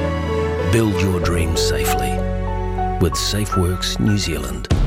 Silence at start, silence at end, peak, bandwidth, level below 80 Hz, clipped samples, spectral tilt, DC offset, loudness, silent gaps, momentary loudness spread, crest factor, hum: 0 s; 0 s; -6 dBFS; 16.5 kHz; -26 dBFS; under 0.1%; -5 dB/octave; under 0.1%; -19 LUFS; none; 5 LU; 14 dB; none